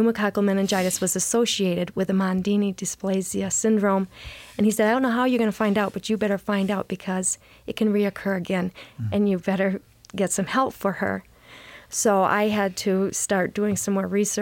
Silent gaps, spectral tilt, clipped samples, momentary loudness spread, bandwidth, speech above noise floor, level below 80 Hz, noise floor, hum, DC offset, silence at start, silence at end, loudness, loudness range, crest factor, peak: none; -4.5 dB/octave; under 0.1%; 8 LU; 17 kHz; 23 dB; -56 dBFS; -46 dBFS; none; under 0.1%; 0 s; 0 s; -23 LUFS; 3 LU; 16 dB; -8 dBFS